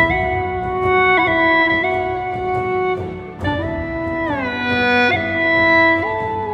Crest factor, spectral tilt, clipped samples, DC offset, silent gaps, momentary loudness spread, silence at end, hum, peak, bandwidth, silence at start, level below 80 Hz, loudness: 16 dB; -6.5 dB/octave; under 0.1%; under 0.1%; none; 10 LU; 0 s; none; -2 dBFS; 8.6 kHz; 0 s; -38 dBFS; -17 LUFS